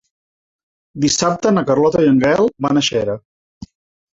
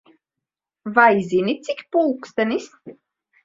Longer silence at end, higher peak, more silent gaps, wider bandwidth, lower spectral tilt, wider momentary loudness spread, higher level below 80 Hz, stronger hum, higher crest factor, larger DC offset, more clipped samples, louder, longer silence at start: about the same, 0.5 s vs 0.5 s; about the same, 0 dBFS vs 0 dBFS; first, 3.25-3.61 s vs none; about the same, 8 kHz vs 7.8 kHz; second, -4.5 dB/octave vs -6 dB/octave; second, 8 LU vs 13 LU; first, -50 dBFS vs -66 dBFS; neither; second, 16 dB vs 22 dB; neither; neither; first, -15 LUFS vs -20 LUFS; about the same, 0.95 s vs 0.85 s